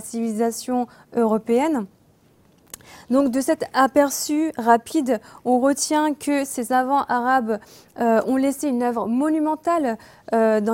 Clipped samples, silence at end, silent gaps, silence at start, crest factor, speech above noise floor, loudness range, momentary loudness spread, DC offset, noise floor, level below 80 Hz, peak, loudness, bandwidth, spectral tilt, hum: under 0.1%; 0 s; none; 0 s; 18 dB; 36 dB; 3 LU; 8 LU; under 0.1%; -56 dBFS; -62 dBFS; -2 dBFS; -21 LUFS; 16.5 kHz; -4 dB/octave; none